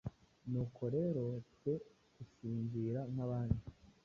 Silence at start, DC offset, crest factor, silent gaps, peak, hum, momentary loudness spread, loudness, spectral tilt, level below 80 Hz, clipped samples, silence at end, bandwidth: 0.05 s; under 0.1%; 20 dB; none; -22 dBFS; none; 15 LU; -41 LUFS; -11 dB/octave; -58 dBFS; under 0.1%; 0.15 s; 6.8 kHz